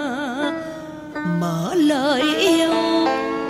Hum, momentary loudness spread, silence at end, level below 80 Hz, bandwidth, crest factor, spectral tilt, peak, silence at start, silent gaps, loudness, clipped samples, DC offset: none; 13 LU; 0 s; -56 dBFS; 16 kHz; 14 dB; -5 dB/octave; -6 dBFS; 0 s; none; -20 LUFS; under 0.1%; under 0.1%